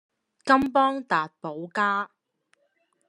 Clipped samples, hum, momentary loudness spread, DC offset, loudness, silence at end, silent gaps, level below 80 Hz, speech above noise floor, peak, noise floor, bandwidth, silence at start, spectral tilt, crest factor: under 0.1%; none; 15 LU; under 0.1%; -24 LUFS; 1.05 s; none; -64 dBFS; 47 dB; -4 dBFS; -71 dBFS; 11 kHz; 0.45 s; -5 dB/octave; 22 dB